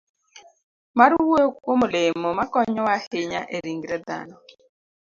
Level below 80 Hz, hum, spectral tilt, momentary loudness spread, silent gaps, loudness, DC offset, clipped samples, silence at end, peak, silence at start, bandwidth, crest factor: -60 dBFS; none; -5 dB/octave; 13 LU; 0.63-0.94 s, 3.07-3.11 s; -22 LUFS; under 0.1%; under 0.1%; 0.8 s; 0 dBFS; 0.35 s; 7.6 kHz; 22 dB